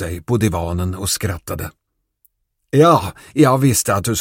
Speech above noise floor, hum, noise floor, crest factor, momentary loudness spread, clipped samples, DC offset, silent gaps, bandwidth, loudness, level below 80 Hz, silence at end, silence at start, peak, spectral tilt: 45 dB; none; -62 dBFS; 18 dB; 13 LU; under 0.1%; under 0.1%; none; 16.5 kHz; -17 LUFS; -40 dBFS; 0 s; 0 s; 0 dBFS; -5 dB/octave